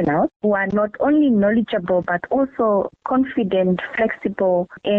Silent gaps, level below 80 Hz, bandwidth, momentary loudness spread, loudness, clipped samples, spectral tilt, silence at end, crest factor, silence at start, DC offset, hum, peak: 0.36-0.40 s; -52 dBFS; 4.3 kHz; 5 LU; -19 LUFS; under 0.1%; -9.5 dB/octave; 0 s; 10 dB; 0 s; under 0.1%; none; -10 dBFS